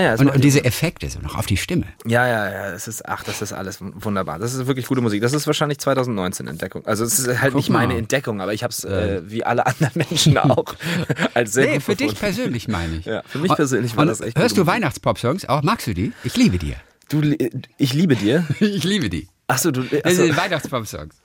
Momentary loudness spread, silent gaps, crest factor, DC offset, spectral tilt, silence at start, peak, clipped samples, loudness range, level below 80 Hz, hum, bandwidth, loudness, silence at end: 10 LU; none; 18 dB; under 0.1%; -5 dB/octave; 0 s; -2 dBFS; under 0.1%; 4 LU; -44 dBFS; none; 17 kHz; -20 LUFS; 0.15 s